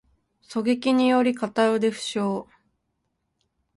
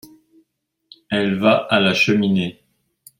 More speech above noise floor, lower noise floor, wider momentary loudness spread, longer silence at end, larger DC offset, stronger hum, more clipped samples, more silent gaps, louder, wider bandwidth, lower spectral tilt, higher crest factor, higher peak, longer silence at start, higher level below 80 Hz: about the same, 54 dB vs 53 dB; first, -76 dBFS vs -70 dBFS; about the same, 9 LU vs 8 LU; first, 1.35 s vs 0.7 s; neither; neither; neither; neither; second, -23 LUFS vs -17 LUFS; second, 11.5 kHz vs 16.5 kHz; about the same, -5 dB/octave vs -5.5 dB/octave; about the same, 18 dB vs 18 dB; second, -8 dBFS vs -2 dBFS; second, 0.5 s vs 1.1 s; second, -68 dBFS vs -60 dBFS